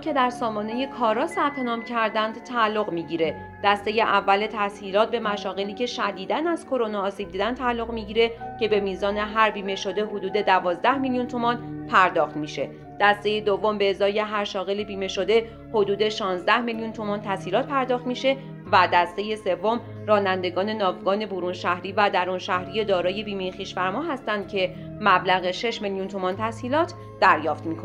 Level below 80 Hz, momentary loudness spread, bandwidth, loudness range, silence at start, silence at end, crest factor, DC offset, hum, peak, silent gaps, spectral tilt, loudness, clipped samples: -54 dBFS; 8 LU; 11.5 kHz; 2 LU; 0 s; 0 s; 20 dB; under 0.1%; none; -4 dBFS; none; -5 dB/octave; -24 LUFS; under 0.1%